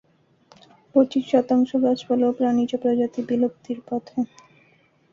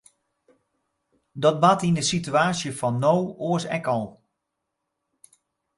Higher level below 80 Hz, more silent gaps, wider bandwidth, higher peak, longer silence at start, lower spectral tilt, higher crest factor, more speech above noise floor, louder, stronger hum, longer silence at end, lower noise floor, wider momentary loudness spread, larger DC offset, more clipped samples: second, -68 dBFS vs -62 dBFS; neither; second, 7.2 kHz vs 11.5 kHz; about the same, -6 dBFS vs -4 dBFS; second, 0.95 s vs 1.35 s; first, -7 dB/octave vs -5 dB/octave; about the same, 18 dB vs 22 dB; second, 38 dB vs 58 dB; about the same, -22 LUFS vs -23 LUFS; neither; second, 0.9 s vs 1.65 s; second, -60 dBFS vs -81 dBFS; about the same, 9 LU vs 8 LU; neither; neither